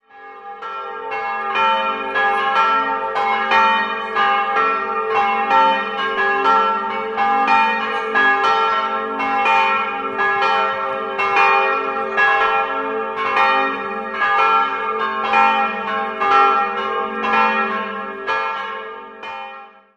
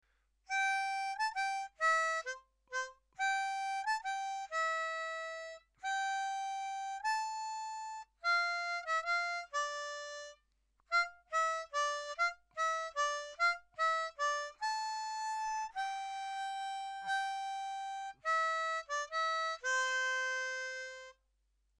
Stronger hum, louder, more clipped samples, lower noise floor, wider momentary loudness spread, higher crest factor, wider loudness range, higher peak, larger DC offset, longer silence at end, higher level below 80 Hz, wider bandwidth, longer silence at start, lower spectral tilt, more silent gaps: neither; first, -17 LUFS vs -36 LUFS; neither; second, -38 dBFS vs -78 dBFS; about the same, 11 LU vs 10 LU; about the same, 16 dB vs 16 dB; about the same, 2 LU vs 3 LU; first, -2 dBFS vs -22 dBFS; neither; second, 0.3 s vs 0.65 s; first, -58 dBFS vs -76 dBFS; second, 8.8 kHz vs 13 kHz; second, 0.15 s vs 0.5 s; first, -3.5 dB/octave vs 3 dB/octave; neither